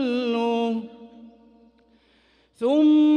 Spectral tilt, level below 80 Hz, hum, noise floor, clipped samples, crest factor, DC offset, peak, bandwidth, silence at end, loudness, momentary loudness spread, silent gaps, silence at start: -6 dB/octave; -70 dBFS; none; -61 dBFS; under 0.1%; 12 dB; under 0.1%; -10 dBFS; 6.6 kHz; 0 s; -22 LUFS; 13 LU; none; 0 s